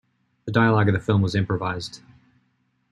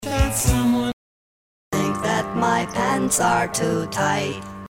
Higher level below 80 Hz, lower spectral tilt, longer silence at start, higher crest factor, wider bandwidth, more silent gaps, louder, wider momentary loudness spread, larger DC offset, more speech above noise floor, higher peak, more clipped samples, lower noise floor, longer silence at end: second, -54 dBFS vs -34 dBFS; first, -7 dB/octave vs -4.5 dB/octave; first, 0.45 s vs 0 s; about the same, 20 dB vs 16 dB; second, 10 kHz vs 16.5 kHz; second, none vs 0.93-1.71 s; about the same, -22 LUFS vs -21 LUFS; first, 15 LU vs 9 LU; neither; second, 47 dB vs over 69 dB; about the same, -4 dBFS vs -6 dBFS; neither; second, -68 dBFS vs under -90 dBFS; first, 0.95 s vs 0.1 s